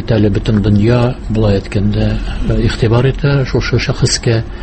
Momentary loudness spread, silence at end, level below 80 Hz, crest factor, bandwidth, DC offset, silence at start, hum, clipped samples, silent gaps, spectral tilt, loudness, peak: 4 LU; 0 s; -22 dBFS; 12 dB; 8.8 kHz; under 0.1%; 0 s; none; under 0.1%; none; -6 dB/octave; -13 LUFS; 0 dBFS